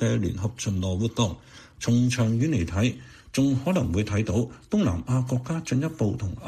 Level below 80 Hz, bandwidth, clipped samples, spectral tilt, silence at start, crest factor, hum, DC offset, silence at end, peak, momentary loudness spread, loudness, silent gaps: -46 dBFS; 13.5 kHz; under 0.1%; -6.5 dB/octave; 0 s; 16 dB; none; under 0.1%; 0 s; -10 dBFS; 5 LU; -26 LUFS; none